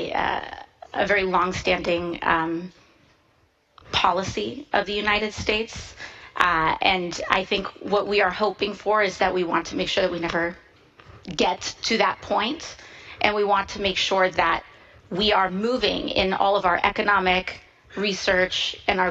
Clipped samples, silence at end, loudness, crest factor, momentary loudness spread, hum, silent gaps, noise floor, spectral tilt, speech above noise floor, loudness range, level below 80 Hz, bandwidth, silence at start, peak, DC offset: under 0.1%; 0 s; -23 LUFS; 24 dB; 13 LU; none; none; -63 dBFS; -3.5 dB/octave; 40 dB; 3 LU; -48 dBFS; 9.6 kHz; 0 s; 0 dBFS; under 0.1%